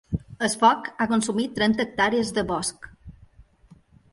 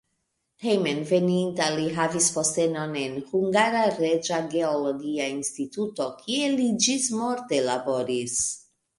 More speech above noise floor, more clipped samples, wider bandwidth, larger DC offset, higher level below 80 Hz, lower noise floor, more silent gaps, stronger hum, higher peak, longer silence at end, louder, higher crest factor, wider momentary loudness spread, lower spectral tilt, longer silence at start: second, 32 dB vs 52 dB; neither; about the same, 11.5 kHz vs 11.5 kHz; neither; first, -50 dBFS vs -66 dBFS; second, -55 dBFS vs -76 dBFS; neither; neither; first, -4 dBFS vs -8 dBFS; first, 1 s vs 0.4 s; about the same, -23 LUFS vs -25 LUFS; about the same, 20 dB vs 18 dB; first, 11 LU vs 8 LU; about the same, -4 dB/octave vs -3.5 dB/octave; second, 0.1 s vs 0.6 s